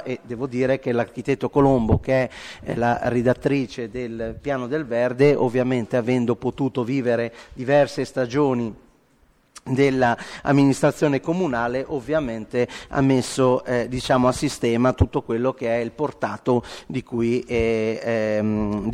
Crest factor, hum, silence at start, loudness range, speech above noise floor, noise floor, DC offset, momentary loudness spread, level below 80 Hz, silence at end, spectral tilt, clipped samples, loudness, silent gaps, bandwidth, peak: 20 dB; none; 0 s; 2 LU; 38 dB; -59 dBFS; under 0.1%; 10 LU; -44 dBFS; 0 s; -6.5 dB/octave; under 0.1%; -22 LUFS; none; 13 kHz; -2 dBFS